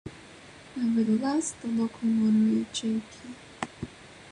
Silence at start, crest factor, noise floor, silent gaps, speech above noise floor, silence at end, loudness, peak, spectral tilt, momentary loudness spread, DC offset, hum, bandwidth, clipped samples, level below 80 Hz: 0.05 s; 18 dB; -49 dBFS; none; 23 dB; 0 s; -28 LUFS; -10 dBFS; -5 dB/octave; 21 LU; under 0.1%; none; 11 kHz; under 0.1%; -60 dBFS